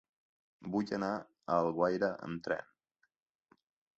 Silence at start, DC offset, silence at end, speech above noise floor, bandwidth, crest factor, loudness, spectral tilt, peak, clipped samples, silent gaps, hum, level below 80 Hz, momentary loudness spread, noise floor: 0.6 s; under 0.1%; 1.35 s; 45 dB; 8 kHz; 20 dB; -35 LUFS; -5.5 dB/octave; -18 dBFS; under 0.1%; none; none; -72 dBFS; 9 LU; -80 dBFS